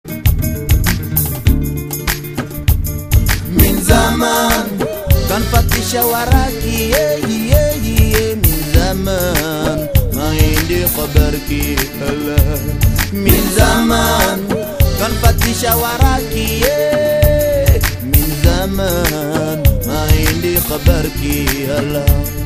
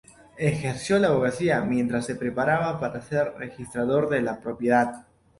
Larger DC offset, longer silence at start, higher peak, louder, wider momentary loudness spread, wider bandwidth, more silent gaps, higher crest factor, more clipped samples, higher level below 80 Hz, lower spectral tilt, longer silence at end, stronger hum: first, 0.2% vs under 0.1%; second, 0.05 s vs 0.35 s; first, 0 dBFS vs -8 dBFS; first, -14 LUFS vs -25 LUFS; second, 5 LU vs 8 LU; first, 16 kHz vs 11.5 kHz; neither; about the same, 14 dB vs 18 dB; first, 0.1% vs under 0.1%; first, -18 dBFS vs -56 dBFS; second, -5 dB/octave vs -6.5 dB/octave; second, 0 s vs 0.4 s; neither